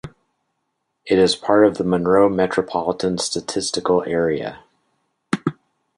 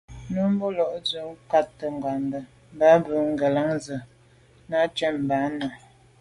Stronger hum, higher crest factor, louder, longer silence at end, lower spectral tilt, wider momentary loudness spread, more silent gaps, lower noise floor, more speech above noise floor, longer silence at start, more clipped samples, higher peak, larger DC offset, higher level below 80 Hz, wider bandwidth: neither; about the same, 18 dB vs 20 dB; first, -19 LUFS vs -24 LUFS; about the same, 0.45 s vs 0.45 s; second, -4.5 dB/octave vs -6 dB/octave; second, 9 LU vs 14 LU; neither; first, -74 dBFS vs -55 dBFS; first, 56 dB vs 32 dB; about the same, 0.05 s vs 0.1 s; neither; first, -2 dBFS vs -6 dBFS; neither; about the same, -52 dBFS vs -56 dBFS; about the same, 11.5 kHz vs 11.5 kHz